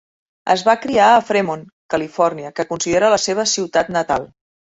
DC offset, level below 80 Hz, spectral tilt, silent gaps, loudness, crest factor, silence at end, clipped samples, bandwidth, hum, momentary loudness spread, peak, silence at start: under 0.1%; -54 dBFS; -3 dB/octave; 1.72-1.89 s; -17 LUFS; 18 dB; 0.5 s; under 0.1%; 8.4 kHz; none; 12 LU; 0 dBFS; 0.45 s